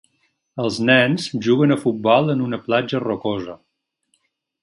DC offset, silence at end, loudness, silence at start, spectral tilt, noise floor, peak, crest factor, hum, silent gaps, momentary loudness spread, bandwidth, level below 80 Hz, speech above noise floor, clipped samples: under 0.1%; 1.1 s; -19 LUFS; 0.55 s; -6 dB/octave; -69 dBFS; 0 dBFS; 20 dB; none; none; 11 LU; 11.5 kHz; -60 dBFS; 51 dB; under 0.1%